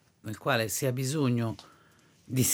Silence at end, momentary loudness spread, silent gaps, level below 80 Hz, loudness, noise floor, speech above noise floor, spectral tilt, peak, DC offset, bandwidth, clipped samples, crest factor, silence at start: 0 s; 10 LU; none; -68 dBFS; -30 LUFS; -61 dBFS; 32 dB; -4.5 dB/octave; -12 dBFS; under 0.1%; 18.5 kHz; under 0.1%; 20 dB; 0.25 s